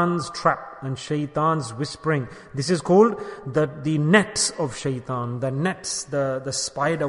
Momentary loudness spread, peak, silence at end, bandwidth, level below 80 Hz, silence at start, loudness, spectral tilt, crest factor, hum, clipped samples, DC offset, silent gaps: 11 LU; -2 dBFS; 0 s; 11 kHz; -56 dBFS; 0 s; -23 LUFS; -5 dB/octave; 22 dB; none; under 0.1%; under 0.1%; none